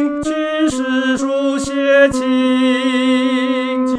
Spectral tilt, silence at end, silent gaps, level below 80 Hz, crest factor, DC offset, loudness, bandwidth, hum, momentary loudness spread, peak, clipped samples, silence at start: -4 dB/octave; 0 s; none; -46 dBFS; 14 dB; under 0.1%; -15 LUFS; 11 kHz; none; 6 LU; 0 dBFS; under 0.1%; 0 s